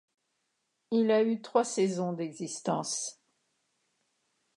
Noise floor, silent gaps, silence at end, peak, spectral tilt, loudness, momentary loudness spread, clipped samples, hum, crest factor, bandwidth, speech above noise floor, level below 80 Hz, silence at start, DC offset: -80 dBFS; none; 1.45 s; -12 dBFS; -4.5 dB/octave; -30 LUFS; 10 LU; under 0.1%; none; 20 dB; 11.5 kHz; 50 dB; -86 dBFS; 0.9 s; under 0.1%